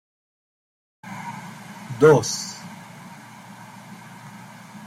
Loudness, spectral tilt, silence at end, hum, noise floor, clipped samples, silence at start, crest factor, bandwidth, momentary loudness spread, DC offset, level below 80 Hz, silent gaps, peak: -20 LUFS; -5 dB/octave; 0 s; none; -42 dBFS; under 0.1%; 1.05 s; 24 dB; 15 kHz; 26 LU; under 0.1%; -62 dBFS; none; -2 dBFS